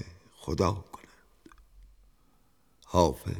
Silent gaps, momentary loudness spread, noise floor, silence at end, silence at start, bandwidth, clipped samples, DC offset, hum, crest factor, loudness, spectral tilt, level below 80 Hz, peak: none; 23 LU; -67 dBFS; 0 s; 0 s; 18.5 kHz; under 0.1%; under 0.1%; none; 26 dB; -29 LUFS; -6 dB/octave; -48 dBFS; -8 dBFS